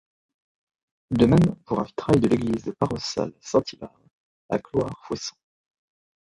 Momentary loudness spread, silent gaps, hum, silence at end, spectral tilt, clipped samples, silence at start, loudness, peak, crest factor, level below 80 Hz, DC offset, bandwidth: 13 LU; 4.11-4.49 s; none; 1.05 s; -7 dB/octave; under 0.1%; 1.1 s; -24 LUFS; -4 dBFS; 22 dB; -48 dBFS; under 0.1%; 11.5 kHz